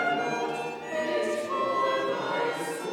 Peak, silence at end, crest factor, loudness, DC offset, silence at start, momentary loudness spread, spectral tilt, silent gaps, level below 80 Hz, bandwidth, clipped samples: -16 dBFS; 0 s; 14 dB; -29 LUFS; under 0.1%; 0 s; 6 LU; -3.5 dB/octave; none; -80 dBFS; 19 kHz; under 0.1%